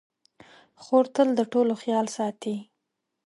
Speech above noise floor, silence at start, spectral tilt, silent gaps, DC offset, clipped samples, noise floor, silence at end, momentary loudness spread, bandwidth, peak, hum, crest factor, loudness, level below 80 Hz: 57 dB; 0.8 s; -5.5 dB/octave; none; under 0.1%; under 0.1%; -81 dBFS; 0.65 s; 11 LU; 11.5 kHz; -6 dBFS; none; 20 dB; -25 LUFS; -78 dBFS